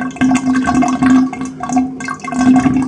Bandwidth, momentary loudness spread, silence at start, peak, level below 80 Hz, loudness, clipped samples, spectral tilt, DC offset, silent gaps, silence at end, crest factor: 10 kHz; 10 LU; 0 s; 0 dBFS; -40 dBFS; -14 LUFS; under 0.1%; -5.5 dB/octave; under 0.1%; none; 0 s; 14 dB